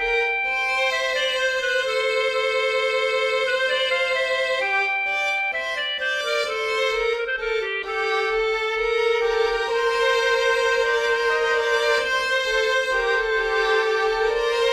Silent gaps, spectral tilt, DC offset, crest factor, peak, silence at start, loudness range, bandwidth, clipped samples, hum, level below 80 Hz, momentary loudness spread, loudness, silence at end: none; -0.5 dB/octave; under 0.1%; 14 dB; -8 dBFS; 0 s; 2 LU; 13.5 kHz; under 0.1%; none; -50 dBFS; 3 LU; -21 LUFS; 0 s